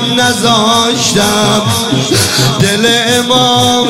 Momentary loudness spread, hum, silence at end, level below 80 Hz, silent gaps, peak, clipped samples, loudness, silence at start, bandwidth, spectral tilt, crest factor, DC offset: 3 LU; none; 0 s; -42 dBFS; none; 0 dBFS; under 0.1%; -9 LUFS; 0 s; 16.5 kHz; -3.5 dB/octave; 10 dB; under 0.1%